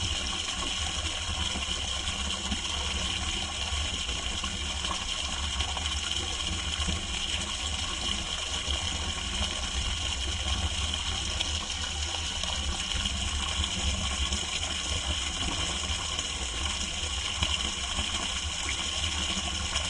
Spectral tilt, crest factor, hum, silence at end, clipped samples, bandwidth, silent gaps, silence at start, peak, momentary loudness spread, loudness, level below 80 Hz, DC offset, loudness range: -2 dB/octave; 20 dB; none; 0 s; under 0.1%; 11.5 kHz; none; 0 s; -12 dBFS; 2 LU; -30 LUFS; -38 dBFS; under 0.1%; 1 LU